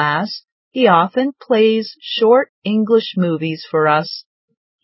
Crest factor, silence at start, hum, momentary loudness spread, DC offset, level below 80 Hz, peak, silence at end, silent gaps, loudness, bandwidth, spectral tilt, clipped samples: 16 dB; 0 s; none; 12 LU; under 0.1%; -70 dBFS; 0 dBFS; 0.65 s; 0.52-0.71 s, 2.49-2.62 s; -16 LUFS; 5.8 kHz; -9.5 dB/octave; under 0.1%